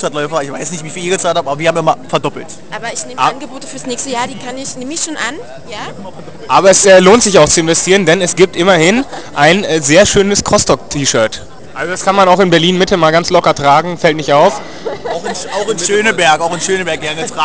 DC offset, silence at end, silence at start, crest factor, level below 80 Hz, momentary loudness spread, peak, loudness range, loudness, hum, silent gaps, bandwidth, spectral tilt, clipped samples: 3%; 0 s; 0 s; 12 dB; -40 dBFS; 16 LU; 0 dBFS; 10 LU; -11 LUFS; none; none; 8 kHz; -3.5 dB/octave; 0.4%